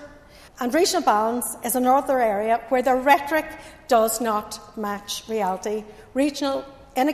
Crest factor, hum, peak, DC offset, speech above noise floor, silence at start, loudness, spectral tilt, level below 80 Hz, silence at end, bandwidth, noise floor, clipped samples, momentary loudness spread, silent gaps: 20 dB; none; -4 dBFS; under 0.1%; 25 dB; 0 s; -22 LUFS; -3 dB/octave; -54 dBFS; 0 s; 14 kHz; -47 dBFS; under 0.1%; 12 LU; none